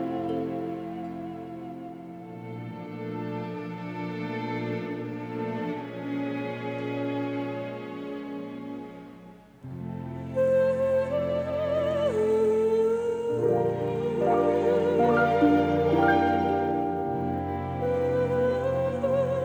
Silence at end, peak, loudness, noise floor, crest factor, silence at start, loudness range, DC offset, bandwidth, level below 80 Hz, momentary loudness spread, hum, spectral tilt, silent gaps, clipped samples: 0 s; -10 dBFS; -27 LUFS; -49 dBFS; 18 dB; 0 s; 12 LU; under 0.1%; over 20 kHz; -56 dBFS; 16 LU; none; -8 dB/octave; none; under 0.1%